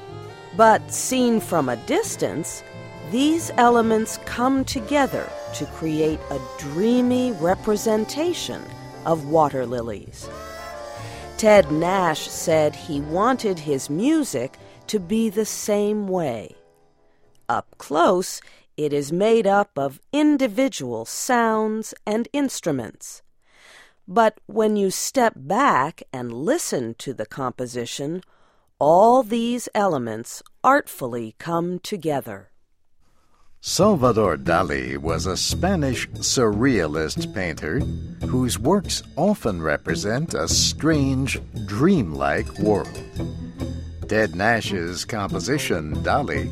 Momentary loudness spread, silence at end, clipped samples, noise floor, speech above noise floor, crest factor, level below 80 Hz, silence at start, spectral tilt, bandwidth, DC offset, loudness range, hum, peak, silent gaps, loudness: 14 LU; 0 s; under 0.1%; -57 dBFS; 36 dB; 20 dB; -44 dBFS; 0 s; -4.5 dB/octave; 16.5 kHz; under 0.1%; 4 LU; none; -2 dBFS; none; -22 LUFS